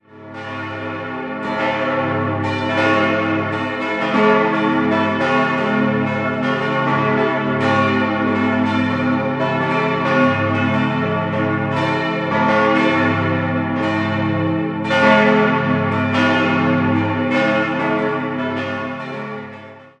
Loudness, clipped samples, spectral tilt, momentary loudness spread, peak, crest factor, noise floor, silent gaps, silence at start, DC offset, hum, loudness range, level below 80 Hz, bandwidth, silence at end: -18 LUFS; under 0.1%; -7 dB/octave; 10 LU; 0 dBFS; 18 dB; -38 dBFS; none; 0.15 s; under 0.1%; none; 3 LU; -48 dBFS; 8.6 kHz; 0.1 s